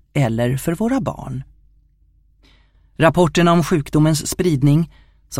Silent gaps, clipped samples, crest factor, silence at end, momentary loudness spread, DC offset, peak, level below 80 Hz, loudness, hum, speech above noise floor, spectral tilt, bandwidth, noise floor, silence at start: none; under 0.1%; 18 dB; 0 s; 12 LU; under 0.1%; 0 dBFS; -42 dBFS; -17 LUFS; none; 39 dB; -6 dB/octave; 16.5 kHz; -55 dBFS; 0.15 s